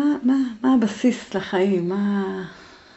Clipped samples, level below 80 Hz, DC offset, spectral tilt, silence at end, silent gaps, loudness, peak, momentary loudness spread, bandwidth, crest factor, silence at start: under 0.1%; -60 dBFS; under 0.1%; -6.5 dB/octave; 0.3 s; none; -21 LUFS; -8 dBFS; 9 LU; 8.2 kHz; 14 dB; 0 s